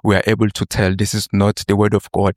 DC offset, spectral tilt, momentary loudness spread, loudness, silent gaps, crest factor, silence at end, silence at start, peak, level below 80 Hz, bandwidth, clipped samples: under 0.1%; -5.5 dB/octave; 3 LU; -17 LUFS; none; 14 dB; 0.05 s; 0.05 s; -2 dBFS; -40 dBFS; 15.5 kHz; under 0.1%